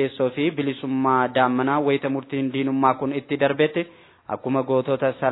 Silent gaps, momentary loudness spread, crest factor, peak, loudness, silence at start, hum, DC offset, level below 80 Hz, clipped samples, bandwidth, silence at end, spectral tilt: none; 6 LU; 18 dB; -4 dBFS; -22 LUFS; 0 s; none; under 0.1%; -68 dBFS; under 0.1%; 4.1 kHz; 0 s; -10.5 dB/octave